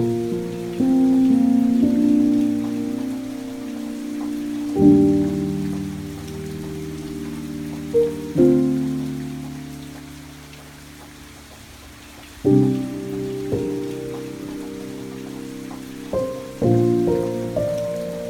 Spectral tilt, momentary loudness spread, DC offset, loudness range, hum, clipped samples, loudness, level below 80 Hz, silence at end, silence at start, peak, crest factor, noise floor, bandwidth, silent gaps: -7.5 dB/octave; 23 LU; under 0.1%; 10 LU; none; under 0.1%; -21 LUFS; -46 dBFS; 0 s; 0 s; -2 dBFS; 18 dB; -41 dBFS; 17.5 kHz; none